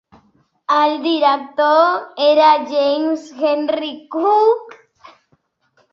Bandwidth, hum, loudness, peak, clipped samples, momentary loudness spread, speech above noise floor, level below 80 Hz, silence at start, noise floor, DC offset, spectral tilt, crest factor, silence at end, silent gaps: 7.4 kHz; none; -16 LUFS; -2 dBFS; under 0.1%; 9 LU; 47 dB; -68 dBFS; 0.7 s; -62 dBFS; under 0.1%; -3.5 dB/octave; 14 dB; 1.2 s; none